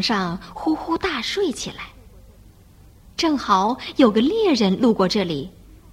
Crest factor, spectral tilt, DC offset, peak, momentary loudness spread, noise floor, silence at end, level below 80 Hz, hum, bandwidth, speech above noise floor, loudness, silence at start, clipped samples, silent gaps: 20 dB; -5 dB/octave; under 0.1%; -2 dBFS; 13 LU; -48 dBFS; 0.15 s; -48 dBFS; none; 16 kHz; 28 dB; -20 LUFS; 0 s; under 0.1%; none